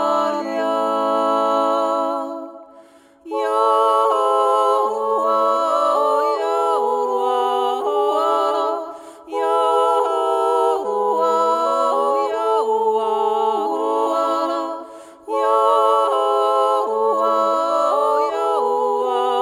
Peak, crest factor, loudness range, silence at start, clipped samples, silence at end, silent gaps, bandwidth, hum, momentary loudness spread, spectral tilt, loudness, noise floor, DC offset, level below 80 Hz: -4 dBFS; 16 dB; 3 LU; 0 s; under 0.1%; 0 s; none; 16 kHz; none; 7 LU; -3 dB/octave; -18 LUFS; -47 dBFS; under 0.1%; -74 dBFS